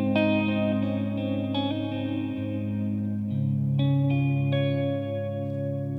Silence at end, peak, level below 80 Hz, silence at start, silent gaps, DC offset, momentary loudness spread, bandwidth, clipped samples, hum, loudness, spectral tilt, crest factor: 0 s; -14 dBFS; -62 dBFS; 0 s; none; under 0.1%; 7 LU; 4.8 kHz; under 0.1%; none; -27 LUFS; -9.5 dB/octave; 12 dB